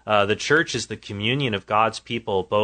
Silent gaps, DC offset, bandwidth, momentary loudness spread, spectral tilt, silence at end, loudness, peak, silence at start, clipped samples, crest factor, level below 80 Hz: none; under 0.1%; 9.4 kHz; 8 LU; -4 dB/octave; 0 s; -22 LUFS; -4 dBFS; 0.05 s; under 0.1%; 20 dB; -56 dBFS